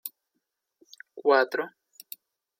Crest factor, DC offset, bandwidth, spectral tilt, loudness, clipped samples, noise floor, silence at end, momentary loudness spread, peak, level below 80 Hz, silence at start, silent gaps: 22 dB; under 0.1%; 16.5 kHz; -2.5 dB/octave; -25 LUFS; under 0.1%; -81 dBFS; 0.9 s; 22 LU; -8 dBFS; under -90 dBFS; 0.05 s; none